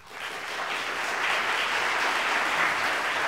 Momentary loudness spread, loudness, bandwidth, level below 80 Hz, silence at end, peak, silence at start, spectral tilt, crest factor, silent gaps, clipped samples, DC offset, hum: 8 LU; -26 LUFS; 16 kHz; -66 dBFS; 0 s; -10 dBFS; 0 s; -0.5 dB/octave; 16 dB; none; under 0.1%; 0.1%; none